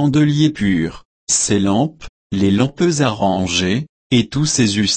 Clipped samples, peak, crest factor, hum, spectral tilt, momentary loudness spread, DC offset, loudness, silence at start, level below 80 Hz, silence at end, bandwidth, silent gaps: under 0.1%; -2 dBFS; 14 dB; none; -4.5 dB/octave; 7 LU; under 0.1%; -17 LUFS; 0 s; -44 dBFS; 0 s; 8.8 kHz; 1.05-1.27 s, 2.09-2.30 s, 3.89-4.10 s